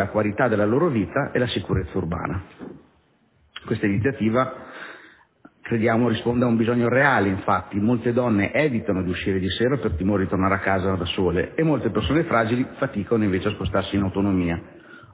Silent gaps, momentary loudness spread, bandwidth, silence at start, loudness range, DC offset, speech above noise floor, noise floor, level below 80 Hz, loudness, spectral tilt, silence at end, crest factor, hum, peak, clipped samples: none; 9 LU; 4 kHz; 0 s; 6 LU; under 0.1%; 39 dB; -61 dBFS; -42 dBFS; -22 LUFS; -11 dB/octave; 0.15 s; 18 dB; none; -4 dBFS; under 0.1%